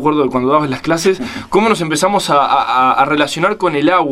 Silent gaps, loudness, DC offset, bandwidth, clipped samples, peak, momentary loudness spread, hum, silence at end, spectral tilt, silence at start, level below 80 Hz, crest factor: none; -13 LUFS; under 0.1%; 15.5 kHz; under 0.1%; 0 dBFS; 3 LU; none; 0 s; -4.5 dB/octave; 0 s; -48 dBFS; 14 dB